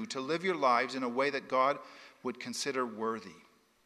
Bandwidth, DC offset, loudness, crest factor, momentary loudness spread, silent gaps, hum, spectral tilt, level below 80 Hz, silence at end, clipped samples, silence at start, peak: 14.5 kHz; under 0.1%; -33 LUFS; 20 dB; 14 LU; none; none; -3.5 dB/octave; -84 dBFS; 0.45 s; under 0.1%; 0 s; -14 dBFS